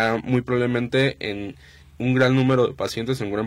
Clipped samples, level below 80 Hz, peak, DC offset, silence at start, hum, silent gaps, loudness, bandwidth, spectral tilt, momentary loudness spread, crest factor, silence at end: under 0.1%; -52 dBFS; -8 dBFS; under 0.1%; 0 s; none; none; -22 LUFS; 13 kHz; -6.5 dB/octave; 11 LU; 14 dB; 0 s